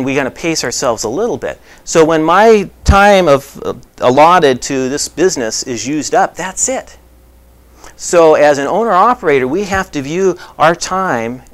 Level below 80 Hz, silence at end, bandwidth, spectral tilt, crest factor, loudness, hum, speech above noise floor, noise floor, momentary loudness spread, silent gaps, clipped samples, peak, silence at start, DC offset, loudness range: -30 dBFS; 0.15 s; 16 kHz; -4 dB/octave; 12 dB; -12 LUFS; none; 31 dB; -43 dBFS; 10 LU; none; 0.2%; 0 dBFS; 0 s; under 0.1%; 5 LU